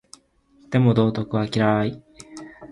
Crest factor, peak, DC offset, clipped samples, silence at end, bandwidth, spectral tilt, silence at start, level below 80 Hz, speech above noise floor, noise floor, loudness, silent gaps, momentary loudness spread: 18 dB; -4 dBFS; under 0.1%; under 0.1%; 0 s; 11.5 kHz; -7.5 dB/octave; 0.7 s; -54 dBFS; 37 dB; -57 dBFS; -21 LUFS; none; 22 LU